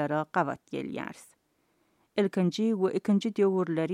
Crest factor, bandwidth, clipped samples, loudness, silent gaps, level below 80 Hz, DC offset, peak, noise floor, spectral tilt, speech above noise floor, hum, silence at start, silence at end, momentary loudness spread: 18 dB; 11.5 kHz; under 0.1%; -29 LUFS; none; -76 dBFS; under 0.1%; -12 dBFS; -72 dBFS; -7 dB/octave; 44 dB; none; 0 s; 0 s; 10 LU